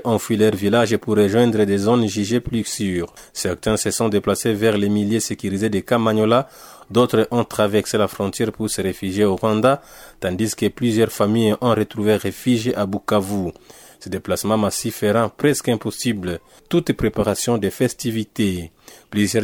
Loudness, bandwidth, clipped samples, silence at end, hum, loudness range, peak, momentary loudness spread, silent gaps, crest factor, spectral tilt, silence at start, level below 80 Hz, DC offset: -20 LUFS; 19 kHz; under 0.1%; 0 s; none; 2 LU; -4 dBFS; 8 LU; none; 16 dB; -5 dB/octave; 0 s; -48 dBFS; under 0.1%